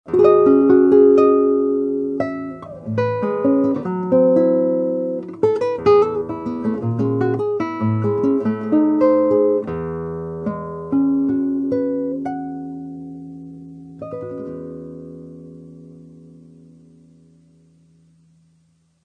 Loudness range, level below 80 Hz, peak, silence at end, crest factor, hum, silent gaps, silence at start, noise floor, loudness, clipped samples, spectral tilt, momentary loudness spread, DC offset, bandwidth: 18 LU; -54 dBFS; -2 dBFS; 3 s; 16 dB; none; none; 0.05 s; -60 dBFS; -18 LUFS; under 0.1%; -10 dB/octave; 21 LU; under 0.1%; 6.2 kHz